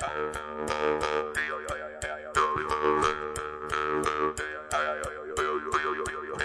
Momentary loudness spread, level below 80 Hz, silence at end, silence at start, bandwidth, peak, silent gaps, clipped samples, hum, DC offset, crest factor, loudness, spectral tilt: 8 LU; -52 dBFS; 0 s; 0 s; 11 kHz; -10 dBFS; none; under 0.1%; none; under 0.1%; 20 dB; -30 LUFS; -3.5 dB/octave